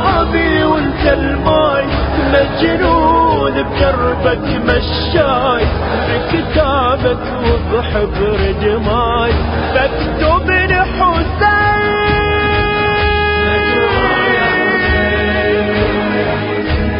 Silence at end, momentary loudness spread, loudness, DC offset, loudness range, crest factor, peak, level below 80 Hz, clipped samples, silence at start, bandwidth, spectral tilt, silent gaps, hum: 0 s; 4 LU; -13 LUFS; under 0.1%; 2 LU; 12 dB; 0 dBFS; -22 dBFS; under 0.1%; 0 s; 5.4 kHz; -10 dB/octave; none; none